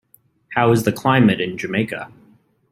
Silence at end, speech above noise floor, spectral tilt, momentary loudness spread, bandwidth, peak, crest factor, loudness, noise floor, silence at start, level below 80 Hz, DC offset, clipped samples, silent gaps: 0.65 s; 37 dB; -6.5 dB/octave; 12 LU; 16 kHz; -2 dBFS; 18 dB; -18 LUFS; -54 dBFS; 0.5 s; -56 dBFS; under 0.1%; under 0.1%; none